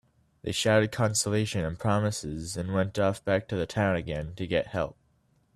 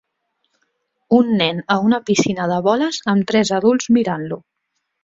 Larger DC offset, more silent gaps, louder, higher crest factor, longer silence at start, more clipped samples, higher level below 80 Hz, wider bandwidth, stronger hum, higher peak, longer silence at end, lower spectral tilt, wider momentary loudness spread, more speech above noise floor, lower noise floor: neither; neither; second, -28 LUFS vs -17 LUFS; about the same, 20 dB vs 18 dB; second, 0.45 s vs 1.1 s; neither; first, -52 dBFS vs -58 dBFS; first, 13.5 kHz vs 7.8 kHz; neither; second, -10 dBFS vs -2 dBFS; about the same, 0.65 s vs 0.65 s; about the same, -5 dB/octave vs -5 dB/octave; first, 10 LU vs 6 LU; second, 40 dB vs 57 dB; second, -68 dBFS vs -74 dBFS